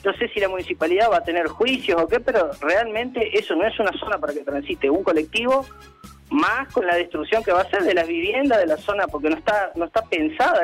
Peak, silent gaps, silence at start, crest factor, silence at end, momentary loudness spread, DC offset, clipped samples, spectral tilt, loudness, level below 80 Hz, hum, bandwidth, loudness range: -8 dBFS; none; 0.05 s; 14 dB; 0 s; 5 LU; under 0.1%; under 0.1%; -4.5 dB/octave; -21 LUFS; -50 dBFS; none; 15.5 kHz; 2 LU